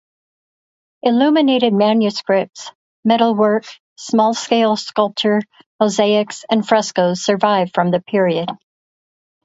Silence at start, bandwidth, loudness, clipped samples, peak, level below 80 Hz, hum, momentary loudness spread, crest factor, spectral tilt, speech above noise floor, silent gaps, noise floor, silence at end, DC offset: 1.05 s; 8 kHz; -16 LUFS; under 0.1%; 0 dBFS; -66 dBFS; none; 9 LU; 16 dB; -5 dB/octave; over 74 dB; 2.75-3.03 s, 3.80-3.96 s, 5.66-5.79 s; under -90 dBFS; 0.9 s; under 0.1%